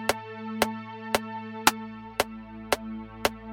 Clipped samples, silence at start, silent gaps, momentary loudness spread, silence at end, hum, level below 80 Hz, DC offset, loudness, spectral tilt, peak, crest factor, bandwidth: under 0.1%; 0 s; none; 13 LU; 0 s; none; -54 dBFS; under 0.1%; -30 LUFS; -2.5 dB/octave; -6 dBFS; 26 dB; 16.5 kHz